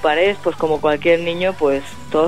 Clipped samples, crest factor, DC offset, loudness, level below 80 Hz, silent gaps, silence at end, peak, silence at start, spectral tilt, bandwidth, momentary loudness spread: under 0.1%; 14 dB; 2%; -18 LUFS; -46 dBFS; none; 0 s; -2 dBFS; 0 s; -5.5 dB/octave; 14 kHz; 5 LU